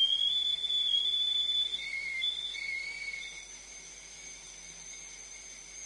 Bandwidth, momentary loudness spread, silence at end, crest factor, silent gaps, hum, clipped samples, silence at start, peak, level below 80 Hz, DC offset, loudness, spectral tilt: 11.5 kHz; 19 LU; 0 s; 14 dB; none; none; under 0.1%; 0 s; -20 dBFS; -64 dBFS; under 0.1%; -29 LUFS; 2.5 dB/octave